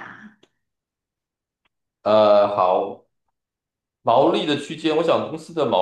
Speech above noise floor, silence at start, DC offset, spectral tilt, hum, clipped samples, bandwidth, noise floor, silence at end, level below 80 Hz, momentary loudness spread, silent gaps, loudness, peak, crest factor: 68 dB; 0 s; under 0.1%; -6 dB/octave; none; under 0.1%; 9.8 kHz; -86 dBFS; 0 s; -72 dBFS; 13 LU; none; -19 LUFS; -4 dBFS; 18 dB